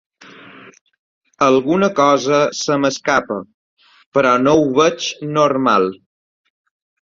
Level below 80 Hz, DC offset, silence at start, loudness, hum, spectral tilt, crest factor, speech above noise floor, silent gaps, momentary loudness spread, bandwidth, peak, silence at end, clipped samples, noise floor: -56 dBFS; under 0.1%; 0.65 s; -15 LUFS; none; -4.5 dB/octave; 16 dB; 26 dB; 0.81-0.86 s, 0.99-1.21 s, 3.54-3.77 s, 4.06-4.12 s; 8 LU; 7.6 kHz; 0 dBFS; 1.1 s; under 0.1%; -41 dBFS